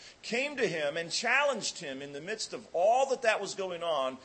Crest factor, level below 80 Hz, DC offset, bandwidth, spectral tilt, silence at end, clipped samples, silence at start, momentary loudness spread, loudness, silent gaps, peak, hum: 20 dB; -78 dBFS; under 0.1%; 8.8 kHz; -2 dB/octave; 0 s; under 0.1%; 0 s; 11 LU; -31 LUFS; none; -12 dBFS; none